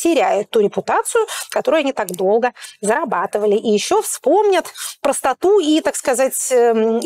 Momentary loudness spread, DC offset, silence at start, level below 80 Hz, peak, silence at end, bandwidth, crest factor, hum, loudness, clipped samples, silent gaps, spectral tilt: 6 LU; under 0.1%; 0 s; -60 dBFS; -6 dBFS; 0 s; 16.5 kHz; 10 dB; none; -17 LUFS; under 0.1%; none; -3 dB/octave